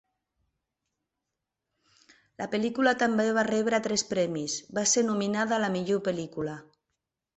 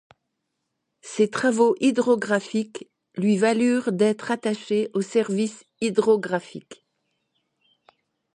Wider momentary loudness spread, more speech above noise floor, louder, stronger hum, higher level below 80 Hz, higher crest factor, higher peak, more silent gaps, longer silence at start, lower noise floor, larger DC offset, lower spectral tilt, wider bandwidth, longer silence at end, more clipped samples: about the same, 10 LU vs 11 LU; about the same, 59 dB vs 56 dB; second, -27 LUFS vs -23 LUFS; neither; about the same, -68 dBFS vs -72 dBFS; about the same, 20 dB vs 18 dB; second, -10 dBFS vs -6 dBFS; neither; first, 2.4 s vs 1.05 s; first, -86 dBFS vs -79 dBFS; neither; second, -3.5 dB/octave vs -5.5 dB/octave; second, 8.2 kHz vs 11 kHz; second, 0.75 s vs 1.6 s; neither